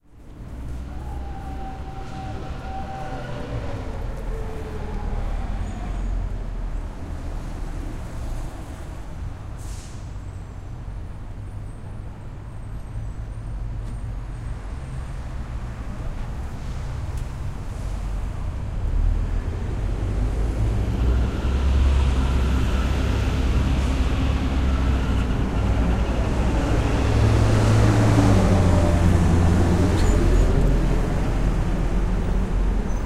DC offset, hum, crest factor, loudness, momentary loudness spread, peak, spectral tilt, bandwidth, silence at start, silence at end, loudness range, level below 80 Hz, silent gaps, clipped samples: under 0.1%; none; 18 dB; -24 LUFS; 17 LU; -4 dBFS; -7 dB/octave; 12.5 kHz; 0.15 s; 0 s; 16 LU; -24 dBFS; none; under 0.1%